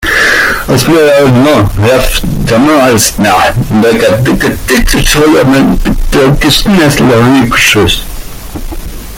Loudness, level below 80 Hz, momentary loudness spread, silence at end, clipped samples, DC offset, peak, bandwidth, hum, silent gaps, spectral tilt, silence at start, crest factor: -7 LUFS; -18 dBFS; 8 LU; 0 s; 0.2%; under 0.1%; 0 dBFS; 17.5 kHz; none; none; -4.5 dB/octave; 0 s; 6 dB